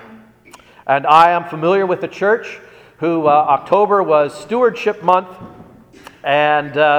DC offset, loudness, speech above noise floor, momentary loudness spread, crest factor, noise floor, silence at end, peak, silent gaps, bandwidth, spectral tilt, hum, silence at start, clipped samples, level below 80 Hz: under 0.1%; -15 LUFS; 30 dB; 11 LU; 16 dB; -44 dBFS; 0 s; 0 dBFS; none; 14 kHz; -6 dB/octave; none; 0.1 s; under 0.1%; -60 dBFS